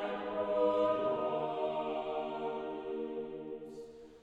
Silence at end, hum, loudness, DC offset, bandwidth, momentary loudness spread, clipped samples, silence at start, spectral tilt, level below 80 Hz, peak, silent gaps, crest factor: 0 s; none; -36 LUFS; under 0.1%; 7.8 kHz; 14 LU; under 0.1%; 0 s; -7 dB/octave; -70 dBFS; -20 dBFS; none; 16 dB